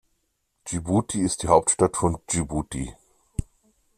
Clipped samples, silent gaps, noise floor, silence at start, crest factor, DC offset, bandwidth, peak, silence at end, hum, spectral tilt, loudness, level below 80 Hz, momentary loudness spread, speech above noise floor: under 0.1%; none; -73 dBFS; 0.65 s; 22 dB; under 0.1%; 14.5 kHz; -4 dBFS; 0.55 s; none; -5 dB/octave; -24 LUFS; -44 dBFS; 15 LU; 50 dB